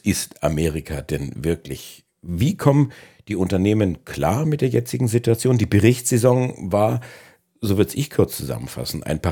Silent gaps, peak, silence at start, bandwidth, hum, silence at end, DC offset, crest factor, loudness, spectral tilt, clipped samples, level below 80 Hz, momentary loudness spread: none; 0 dBFS; 0.05 s; 19 kHz; none; 0 s; under 0.1%; 20 dB; -21 LUFS; -6 dB/octave; under 0.1%; -42 dBFS; 12 LU